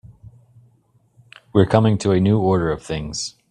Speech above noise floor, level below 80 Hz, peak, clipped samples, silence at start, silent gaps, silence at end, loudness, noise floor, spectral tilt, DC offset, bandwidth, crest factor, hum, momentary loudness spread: 42 dB; -46 dBFS; 0 dBFS; under 0.1%; 0.05 s; none; 0.2 s; -19 LUFS; -59 dBFS; -6.5 dB/octave; under 0.1%; 10 kHz; 20 dB; none; 11 LU